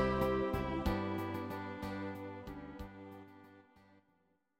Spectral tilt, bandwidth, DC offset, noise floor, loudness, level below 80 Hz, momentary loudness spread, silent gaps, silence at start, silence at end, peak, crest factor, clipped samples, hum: -7.5 dB/octave; 16.5 kHz; under 0.1%; -77 dBFS; -39 LUFS; -50 dBFS; 19 LU; none; 0 s; 1 s; -20 dBFS; 20 dB; under 0.1%; none